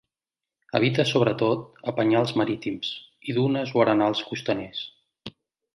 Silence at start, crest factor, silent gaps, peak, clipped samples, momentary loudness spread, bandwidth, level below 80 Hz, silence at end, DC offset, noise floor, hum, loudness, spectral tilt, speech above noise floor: 0.75 s; 20 dB; none; -6 dBFS; under 0.1%; 15 LU; 11.5 kHz; -64 dBFS; 0.45 s; under 0.1%; -90 dBFS; none; -24 LUFS; -6.5 dB/octave; 66 dB